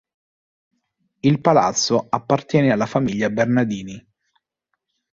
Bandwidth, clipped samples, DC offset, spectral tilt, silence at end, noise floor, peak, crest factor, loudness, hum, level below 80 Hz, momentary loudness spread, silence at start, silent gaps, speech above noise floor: 7.6 kHz; under 0.1%; under 0.1%; -5 dB/octave; 1.15 s; -77 dBFS; -2 dBFS; 20 dB; -19 LUFS; none; -56 dBFS; 6 LU; 1.25 s; none; 59 dB